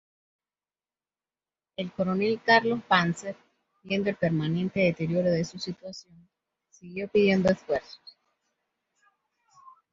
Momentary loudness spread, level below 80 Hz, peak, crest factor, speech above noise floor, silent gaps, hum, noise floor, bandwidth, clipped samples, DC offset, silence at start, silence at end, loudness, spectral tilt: 19 LU; -62 dBFS; -4 dBFS; 24 dB; over 64 dB; none; none; under -90 dBFS; 8 kHz; under 0.1%; under 0.1%; 1.8 s; 1.95 s; -26 LUFS; -6 dB/octave